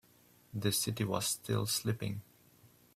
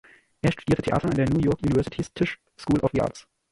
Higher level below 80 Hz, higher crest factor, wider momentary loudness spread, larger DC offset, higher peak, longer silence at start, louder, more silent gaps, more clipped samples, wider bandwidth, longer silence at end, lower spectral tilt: second, -66 dBFS vs -44 dBFS; about the same, 20 dB vs 16 dB; first, 9 LU vs 6 LU; neither; second, -18 dBFS vs -8 dBFS; about the same, 0.55 s vs 0.45 s; second, -34 LUFS vs -25 LUFS; neither; neither; first, 16 kHz vs 11.5 kHz; first, 0.75 s vs 0.3 s; second, -4 dB/octave vs -7.5 dB/octave